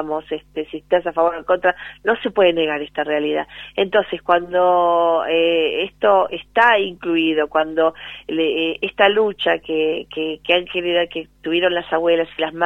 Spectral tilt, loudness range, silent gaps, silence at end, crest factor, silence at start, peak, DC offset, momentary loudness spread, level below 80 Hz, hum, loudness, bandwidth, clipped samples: -6 dB/octave; 3 LU; none; 0 s; 18 dB; 0 s; 0 dBFS; under 0.1%; 9 LU; -54 dBFS; none; -18 LUFS; 5.8 kHz; under 0.1%